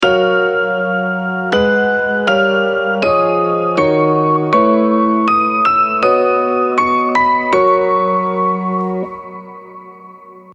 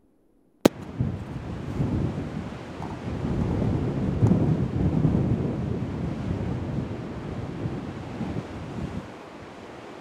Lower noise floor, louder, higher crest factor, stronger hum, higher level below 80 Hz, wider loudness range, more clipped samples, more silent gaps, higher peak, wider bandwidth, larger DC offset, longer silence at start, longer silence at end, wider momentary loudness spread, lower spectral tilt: second, -37 dBFS vs -62 dBFS; first, -14 LUFS vs -28 LUFS; second, 14 dB vs 28 dB; neither; second, -50 dBFS vs -42 dBFS; second, 2 LU vs 7 LU; neither; neither; about the same, 0 dBFS vs 0 dBFS; second, 9.2 kHz vs 16 kHz; neither; second, 0 s vs 0.65 s; about the same, 0 s vs 0 s; second, 6 LU vs 13 LU; second, -6.5 dB/octave vs -8 dB/octave